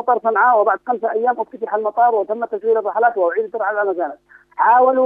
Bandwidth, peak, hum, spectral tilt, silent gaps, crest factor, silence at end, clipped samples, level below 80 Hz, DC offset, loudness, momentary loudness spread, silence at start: 3.7 kHz; -2 dBFS; 50 Hz at -70 dBFS; -7.5 dB/octave; none; 14 dB; 0 s; under 0.1%; -70 dBFS; under 0.1%; -17 LUFS; 9 LU; 0 s